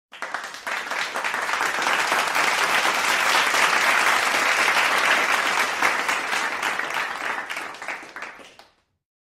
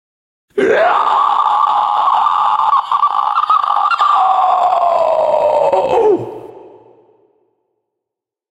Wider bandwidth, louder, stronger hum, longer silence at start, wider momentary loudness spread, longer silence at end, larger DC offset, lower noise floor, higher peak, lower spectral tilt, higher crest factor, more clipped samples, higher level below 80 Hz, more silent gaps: first, 16 kHz vs 10.5 kHz; second, -21 LUFS vs -13 LUFS; neither; second, 0.15 s vs 0.55 s; first, 13 LU vs 3 LU; second, 0.85 s vs 1.85 s; neither; second, -55 dBFS vs -83 dBFS; second, -6 dBFS vs -2 dBFS; second, 0 dB/octave vs -4.5 dB/octave; first, 18 dB vs 12 dB; neither; second, -66 dBFS vs -58 dBFS; neither